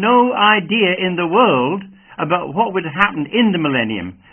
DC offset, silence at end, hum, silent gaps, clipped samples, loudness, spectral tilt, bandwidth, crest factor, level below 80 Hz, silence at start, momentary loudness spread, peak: under 0.1%; 0.2 s; none; none; under 0.1%; -16 LUFS; -8 dB/octave; 3.4 kHz; 16 dB; -54 dBFS; 0 s; 10 LU; 0 dBFS